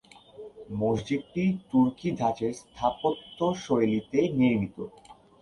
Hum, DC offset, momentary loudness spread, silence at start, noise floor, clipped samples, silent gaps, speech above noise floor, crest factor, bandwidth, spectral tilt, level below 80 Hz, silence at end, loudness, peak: none; under 0.1%; 14 LU; 0.4 s; -47 dBFS; under 0.1%; none; 20 dB; 16 dB; 11 kHz; -7 dB/octave; -58 dBFS; 0.3 s; -28 LUFS; -10 dBFS